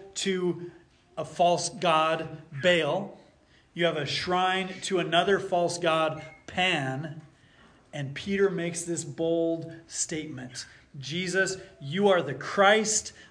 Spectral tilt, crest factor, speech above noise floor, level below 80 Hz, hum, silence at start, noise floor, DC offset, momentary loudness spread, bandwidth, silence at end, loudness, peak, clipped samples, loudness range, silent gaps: -3.5 dB/octave; 20 dB; 33 dB; -64 dBFS; none; 0 s; -60 dBFS; under 0.1%; 15 LU; 10.5 kHz; 0.05 s; -27 LUFS; -8 dBFS; under 0.1%; 4 LU; none